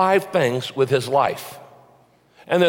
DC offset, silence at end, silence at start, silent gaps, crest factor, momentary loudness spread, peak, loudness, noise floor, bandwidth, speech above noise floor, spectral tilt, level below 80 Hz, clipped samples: under 0.1%; 0 s; 0 s; none; 16 dB; 16 LU; -6 dBFS; -20 LUFS; -55 dBFS; 17 kHz; 35 dB; -5.5 dB/octave; -66 dBFS; under 0.1%